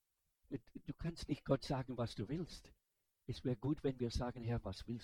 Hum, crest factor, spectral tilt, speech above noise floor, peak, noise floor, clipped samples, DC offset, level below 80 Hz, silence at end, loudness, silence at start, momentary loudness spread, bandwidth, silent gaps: none; 22 dB; -7 dB/octave; 37 dB; -20 dBFS; -79 dBFS; under 0.1%; under 0.1%; -56 dBFS; 0 s; -43 LUFS; 0.5 s; 12 LU; 13.5 kHz; none